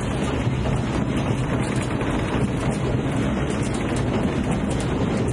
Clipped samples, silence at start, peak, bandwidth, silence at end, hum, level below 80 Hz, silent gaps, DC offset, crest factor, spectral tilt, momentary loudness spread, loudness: under 0.1%; 0 s; -10 dBFS; 11.5 kHz; 0 s; none; -34 dBFS; none; under 0.1%; 12 dB; -6.5 dB/octave; 1 LU; -23 LUFS